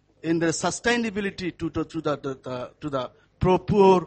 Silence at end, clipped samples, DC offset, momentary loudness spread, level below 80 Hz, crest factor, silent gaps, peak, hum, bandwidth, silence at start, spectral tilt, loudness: 0 s; under 0.1%; under 0.1%; 12 LU; -46 dBFS; 18 dB; none; -6 dBFS; none; 8.8 kHz; 0.25 s; -5.5 dB/octave; -25 LUFS